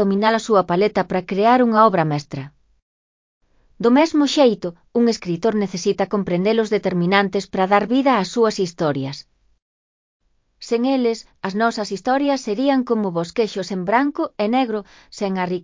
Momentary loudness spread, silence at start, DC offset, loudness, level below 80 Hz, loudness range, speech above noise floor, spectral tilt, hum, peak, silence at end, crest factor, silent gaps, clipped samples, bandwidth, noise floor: 11 LU; 0 s; under 0.1%; -19 LUFS; -58 dBFS; 4 LU; over 71 dB; -6 dB/octave; none; -2 dBFS; 0 s; 18 dB; 2.82-3.41 s, 9.62-10.20 s; under 0.1%; 7.6 kHz; under -90 dBFS